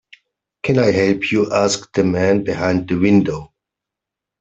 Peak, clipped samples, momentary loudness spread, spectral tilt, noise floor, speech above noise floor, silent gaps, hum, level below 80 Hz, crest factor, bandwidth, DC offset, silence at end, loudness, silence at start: -2 dBFS; under 0.1%; 5 LU; -5.5 dB/octave; -84 dBFS; 68 dB; none; none; -50 dBFS; 16 dB; 8.2 kHz; under 0.1%; 0.95 s; -17 LUFS; 0.65 s